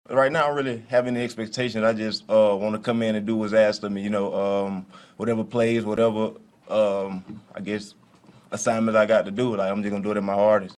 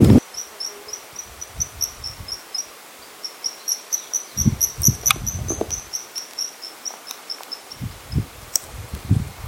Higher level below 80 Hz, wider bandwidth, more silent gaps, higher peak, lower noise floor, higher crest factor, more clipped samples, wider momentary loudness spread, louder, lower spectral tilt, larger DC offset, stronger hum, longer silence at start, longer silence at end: second, -64 dBFS vs -38 dBFS; second, 11 kHz vs 17 kHz; neither; second, -6 dBFS vs 0 dBFS; first, -53 dBFS vs -42 dBFS; second, 16 dB vs 24 dB; neither; second, 11 LU vs 16 LU; about the same, -23 LUFS vs -24 LUFS; first, -5.5 dB/octave vs -3.5 dB/octave; neither; neither; about the same, 0.1 s vs 0 s; about the same, 0.05 s vs 0 s